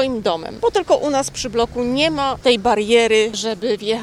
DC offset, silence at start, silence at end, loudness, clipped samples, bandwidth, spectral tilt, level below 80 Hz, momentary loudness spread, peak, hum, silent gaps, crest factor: under 0.1%; 0 s; 0 s; -18 LUFS; under 0.1%; 13.5 kHz; -3.5 dB/octave; -44 dBFS; 7 LU; -2 dBFS; none; none; 16 dB